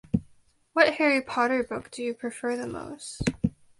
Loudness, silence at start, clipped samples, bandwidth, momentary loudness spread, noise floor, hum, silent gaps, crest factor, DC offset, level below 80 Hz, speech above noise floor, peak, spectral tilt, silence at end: -27 LUFS; 0.15 s; under 0.1%; 11.5 kHz; 12 LU; -60 dBFS; none; none; 22 dB; under 0.1%; -50 dBFS; 33 dB; -6 dBFS; -5 dB/octave; 0.3 s